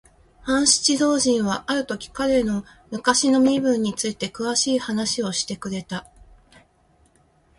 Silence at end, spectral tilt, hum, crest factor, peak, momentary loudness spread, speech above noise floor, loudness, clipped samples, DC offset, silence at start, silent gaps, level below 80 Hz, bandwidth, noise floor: 1.6 s; -3 dB/octave; none; 20 dB; -4 dBFS; 13 LU; 38 dB; -21 LUFS; under 0.1%; under 0.1%; 0.45 s; none; -52 dBFS; 11.5 kHz; -60 dBFS